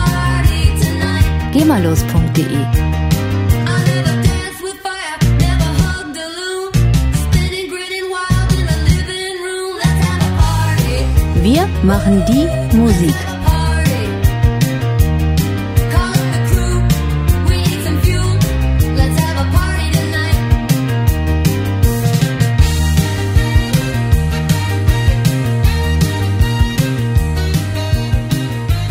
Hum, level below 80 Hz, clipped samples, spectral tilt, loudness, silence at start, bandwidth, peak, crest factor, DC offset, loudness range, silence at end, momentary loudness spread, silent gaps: none; -20 dBFS; under 0.1%; -6 dB/octave; -15 LUFS; 0 s; 16.5 kHz; 0 dBFS; 14 dB; under 0.1%; 3 LU; 0 s; 5 LU; none